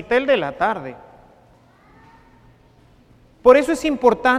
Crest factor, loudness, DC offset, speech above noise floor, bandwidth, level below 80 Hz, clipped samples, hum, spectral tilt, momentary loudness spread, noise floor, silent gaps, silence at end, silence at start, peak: 20 dB; -17 LUFS; under 0.1%; 35 dB; 13.5 kHz; -50 dBFS; under 0.1%; none; -4.5 dB/octave; 11 LU; -52 dBFS; none; 0 s; 0 s; 0 dBFS